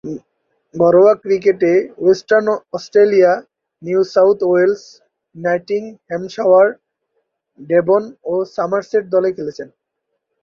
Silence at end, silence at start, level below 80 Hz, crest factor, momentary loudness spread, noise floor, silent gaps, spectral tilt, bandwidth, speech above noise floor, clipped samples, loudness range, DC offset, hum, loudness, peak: 0.75 s; 0.05 s; -62 dBFS; 14 dB; 15 LU; -74 dBFS; none; -6.5 dB/octave; 7 kHz; 60 dB; under 0.1%; 5 LU; under 0.1%; none; -15 LUFS; -2 dBFS